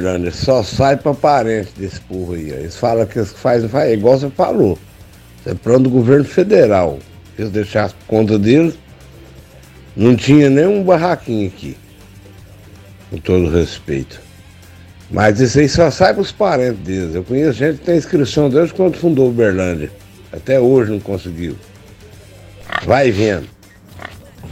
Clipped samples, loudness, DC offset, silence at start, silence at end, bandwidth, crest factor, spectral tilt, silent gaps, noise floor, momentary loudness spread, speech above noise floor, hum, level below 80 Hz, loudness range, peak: under 0.1%; -14 LUFS; under 0.1%; 0 s; 0 s; 15.5 kHz; 14 dB; -7 dB/octave; none; -40 dBFS; 15 LU; 26 dB; none; -40 dBFS; 5 LU; 0 dBFS